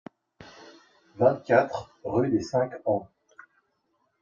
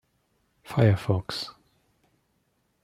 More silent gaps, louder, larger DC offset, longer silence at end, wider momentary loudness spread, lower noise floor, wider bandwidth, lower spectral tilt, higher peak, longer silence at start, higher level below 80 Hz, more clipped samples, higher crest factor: neither; about the same, -26 LUFS vs -26 LUFS; neither; second, 1.15 s vs 1.35 s; about the same, 12 LU vs 12 LU; about the same, -73 dBFS vs -72 dBFS; second, 7.6 kHz vs 13.5 kHz; about the same, -7 dB/octave vs -7 dB/octave; about the same, -6 dBFS vs -8 dBFS; second, 0.4 s vs 0.7 s; second, -64 dBFS vs -58 dBFS; neither; about the same, 22 dB vs 22 dB